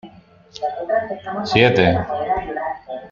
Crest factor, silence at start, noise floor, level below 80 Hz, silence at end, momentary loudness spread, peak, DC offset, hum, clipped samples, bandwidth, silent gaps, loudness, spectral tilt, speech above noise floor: 20 dB; 0.05 s; -46 dBFS; -46 dBFS; 0.05 s; 13 LU; 0 dBFS; under 0.1%; none; under 0.1%; 7.4 kHz; none; -19 LUFS; -6.5 dB/octave; 27 dB